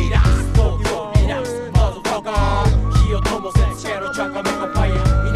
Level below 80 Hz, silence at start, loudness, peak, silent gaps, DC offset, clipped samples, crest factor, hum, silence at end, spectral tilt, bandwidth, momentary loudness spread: -20 dBFS; 0 s; -19 LUFS; -2 dBFS; none; under 0.1%; under 0.1%; 16 dB; none; 0 s; -6 dB/octave; 12.5 kHz; 6 LU